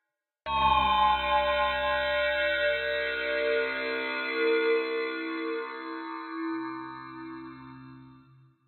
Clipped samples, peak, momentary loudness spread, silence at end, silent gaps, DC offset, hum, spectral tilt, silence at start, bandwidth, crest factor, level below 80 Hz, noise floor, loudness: under 0.1%; -12 dBFS; 17 LU; 0.5 s; none; under 0.1%; none; -6.5 dB/octave; 0.45 s; 16 kHz; 16 dB; -50 dBFS; -58 dBFS; -28 LUFS